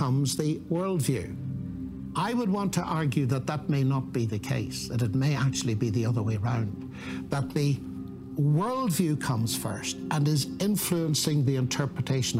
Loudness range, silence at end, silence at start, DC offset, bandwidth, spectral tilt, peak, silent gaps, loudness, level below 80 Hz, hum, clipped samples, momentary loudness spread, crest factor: 2 LU; 0 s; 0 s; under 0.1%; 16 kHz; -5.5 dB/octave; -12 dBFS; none; -28 LUFS; -54 dBFS; none; under 0.1%; 9 LU; 14 dB